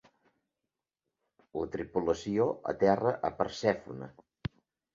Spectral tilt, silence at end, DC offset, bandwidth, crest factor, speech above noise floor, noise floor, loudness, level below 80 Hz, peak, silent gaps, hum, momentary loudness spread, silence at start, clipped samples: -6.5 dB/octave; 0.45 s; under 0.1%; 7.6 kHz; 22 dB; 58 dB; -89 dBFS; -31 LUFS; -60 dBFS; -12 dBFS; none; none; 16 LU; 1.55 s; under 0.1%